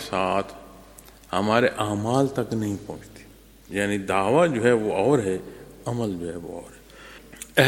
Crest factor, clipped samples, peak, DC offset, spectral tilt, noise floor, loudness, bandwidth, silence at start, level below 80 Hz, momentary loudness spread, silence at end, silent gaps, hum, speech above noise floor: 24 dB; under 0.1%; 0 dBFS; under 0.1%; -5.5 dB/octave; -49 dBFS; -24 LUFS; 17 kHz; 0 s; -54 dBFS; 21 LU; 0 s; none; none; 25 dB